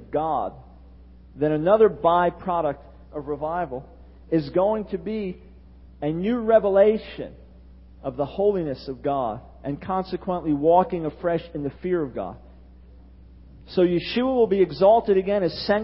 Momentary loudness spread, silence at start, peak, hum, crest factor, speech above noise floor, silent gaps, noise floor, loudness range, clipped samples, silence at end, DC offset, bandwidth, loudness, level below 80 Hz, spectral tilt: 16 LU; 0 s; -4 dBFS; none; 18 dB; 25 dB; none; -47 dBFS; 5 LU; under 0.1%; 0 s; under 0.1%; 5.8 kHz; -23 LUFS; -48 dBFS; -11 dB/octave